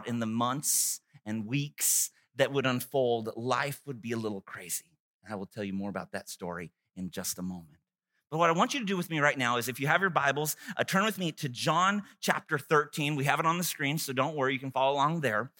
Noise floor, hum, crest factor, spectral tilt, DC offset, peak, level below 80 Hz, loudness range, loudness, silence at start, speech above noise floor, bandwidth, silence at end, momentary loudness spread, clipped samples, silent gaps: -82 dBFS; none; 24 dB; -3.5 dB/octave; under 0.1%; -6 dBFS; -76 dBFS; 10 LU; -30 LUFS; 0 s; 51 dB; 17 kHz; 0.1 s; 13 LU; under 0.1%; 5.00-5.20 s